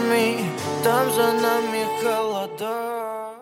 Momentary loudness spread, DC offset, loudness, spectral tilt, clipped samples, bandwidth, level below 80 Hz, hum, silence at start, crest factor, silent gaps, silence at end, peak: 8 LU; under 0.1%; -23 LUFS; -4 dB/octave; under 0.1%; 17 kHz; -68 dBFS; none; 0 s; 16 dB; none; 0 s; -6 dBFS